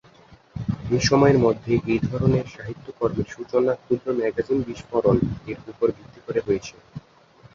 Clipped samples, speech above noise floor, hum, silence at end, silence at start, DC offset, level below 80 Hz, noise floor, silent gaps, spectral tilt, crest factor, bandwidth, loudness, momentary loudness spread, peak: under 0.1%; 30 dB; none; 0.55 s; 0.55 s; under 0.1%; -46 dBFS; -52 dBFS; none; -6.5 dB/octave; 20 dB; 7.6 kHz; -23 LUFS; 18 LU; -4 dBFS